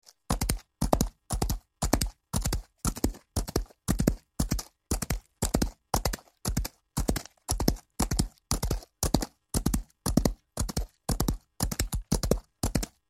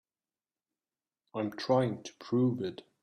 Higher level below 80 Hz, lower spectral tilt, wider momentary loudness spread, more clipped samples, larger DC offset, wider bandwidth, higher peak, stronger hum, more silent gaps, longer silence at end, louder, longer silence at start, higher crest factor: first, -34 dBFS vs -76 dBFS; second, -4.5 dB/octave vs -7 dB/octave; second, 6 LU vs 12 LU; neither; neither; first, 16.5 kHz vs 10 kHz; first, -4 dBFS vs -14 dBFS; neither; neither; about the same, 0.2 s vs 0.25 s; about the same, -31 LUFS vs -32 LUFS; second, 0.3 s vs 1.35 s; first, 28 dB vs 20 dB